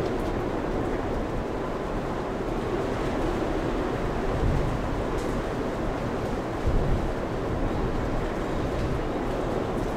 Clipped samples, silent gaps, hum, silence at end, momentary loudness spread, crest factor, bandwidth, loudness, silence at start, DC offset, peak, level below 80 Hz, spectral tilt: under 0.1%; none; none; 0 s; 3 LU; 14 dB; 14.5 kHz; -29 LUFS; 0 s; under 0.1%; -12 dBFS; -32 dBFS; -7 dB/octave